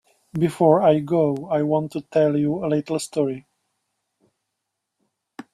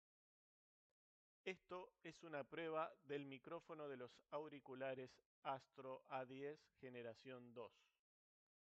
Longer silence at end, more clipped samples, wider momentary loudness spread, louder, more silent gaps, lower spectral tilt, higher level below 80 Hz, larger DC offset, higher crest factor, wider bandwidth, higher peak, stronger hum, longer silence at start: second, 0.1 s vs 1.05 s; neither; about the same, 9 LU vs 10 LU; first, -21 LUFS vs -54 LUFS; second, none vs 5.26-5.42 s; first, -7 dB/octave vs -3.5 dB/octave; first, -62 dBFS vs under -90 dBFS; neither; about the same, 20 dB vs 22 dB; first, 13.5 kHz vs 8 kHz; first, -2 dBFS vs -34 dBFS; neither; second, 0.35 s vs 1.45 s